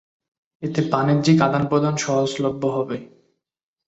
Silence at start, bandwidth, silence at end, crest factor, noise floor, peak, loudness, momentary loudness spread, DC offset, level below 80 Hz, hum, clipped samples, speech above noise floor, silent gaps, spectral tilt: 0.6 s; 8.2 kHz; 0.8 s; 20 dB; -65 dBFS; -2 dBFS; -20 LUFS; 11 LU; under 0.1%; -58 dBFS; none; under 0.1%; 45 dB; none; -6 dB/octave